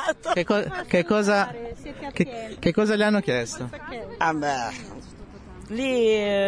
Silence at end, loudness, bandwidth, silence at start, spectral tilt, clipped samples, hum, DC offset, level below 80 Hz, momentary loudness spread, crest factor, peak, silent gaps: 0 s; -24 LUFS; 10.5 kHz; 0 s; -5 dB/octave; under 0.1%; none; under 0.1%; -50 dBFS; 17 LU; 18 dB; -6 dBFS; none